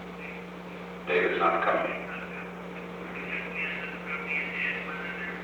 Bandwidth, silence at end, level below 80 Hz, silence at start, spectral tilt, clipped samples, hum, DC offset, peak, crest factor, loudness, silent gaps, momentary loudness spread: over 20 kHz; 0 s; -60 dBFS; 0 s; -6 dB/octave; under 0.1%; none; under 0.1%; -12 dBFS; 20 dB; -31 LUFS; none; 14 LU